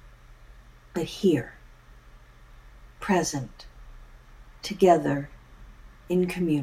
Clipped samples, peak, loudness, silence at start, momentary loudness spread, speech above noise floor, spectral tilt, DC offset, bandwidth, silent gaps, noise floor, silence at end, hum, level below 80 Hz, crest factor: under 0.1%; -6 dBFS; -26 LUFS; 0.05 s; 22 LU; 26 dB; -5.5 dB/octave; under 0.1%; 15.5 kHz; none; -51 dBFS; 0 s; none; -50 dBFS; 22 dB